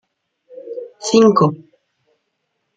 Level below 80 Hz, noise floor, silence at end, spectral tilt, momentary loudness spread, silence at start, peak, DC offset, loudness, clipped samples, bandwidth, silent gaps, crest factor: -62 dBFS; -72 dBFS; 1.2 s; -6 dB/octave; 24 LU; 0.65 s; -2 dBFS; under 0.1%; -14 LUFS; under 0.1%; 9.2 kHz; none; 18 dB